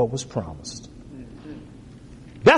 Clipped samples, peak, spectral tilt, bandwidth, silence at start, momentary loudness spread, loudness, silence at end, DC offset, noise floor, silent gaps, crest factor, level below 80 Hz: under 0.1%; -4 dBFS; -5 dB/octave; 11 kHz; 0 s; 19 LU; -28 LUFS; 0 s; under 0.1%; -43 dBFS; none; 20 dB; -48 dBFS